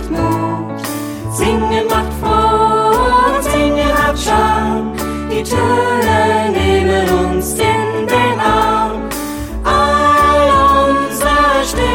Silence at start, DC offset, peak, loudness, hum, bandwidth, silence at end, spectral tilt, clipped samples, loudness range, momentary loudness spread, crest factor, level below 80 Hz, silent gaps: 0 s; under 0.1%; -2 dBFS; -13 LUFS; none; 17.5 kHz; 0 s; -5 dB/octave; under 0.1%; 2 LU; 10 LU; 12 dB; -26 dBFS; none